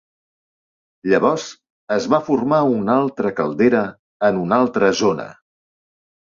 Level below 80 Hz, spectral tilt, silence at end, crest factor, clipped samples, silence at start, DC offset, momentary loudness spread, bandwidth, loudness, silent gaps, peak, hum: -58 dBFS; -6 dB/octave; 1 s; 18 dB; under 0.1%; 1.05 s; under 0.1%; 10 LU; 7.6 kHz; -18 LUFS; 1.70-1.87 s, 3.99-4.20 s; -2 dBFS; none